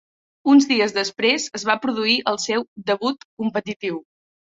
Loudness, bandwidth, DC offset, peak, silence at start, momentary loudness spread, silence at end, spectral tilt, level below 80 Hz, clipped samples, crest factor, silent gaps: -20 LUFS; 7.8 kHz; under 0.1%; -2 dBFS; 0.45 s; 12 LU; 0.5 s; -3 dB/octave; -66 dBFS; under 0.1%; 20 dB; 2.68-2.76 s, 3.25-3.37 s, 3.76-3.80 s